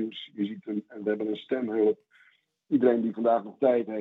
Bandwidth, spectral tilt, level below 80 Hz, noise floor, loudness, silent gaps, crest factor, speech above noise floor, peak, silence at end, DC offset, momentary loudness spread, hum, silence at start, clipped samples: 4.1 kHz; -9 dB/octave; -82 dBFS; -64 dBFS; -28 LUFS; none; 18 dB; 37 dB; -10 dBFS; 0 s; under 0.1%; 11 LU; none; 0 s; under 0.1%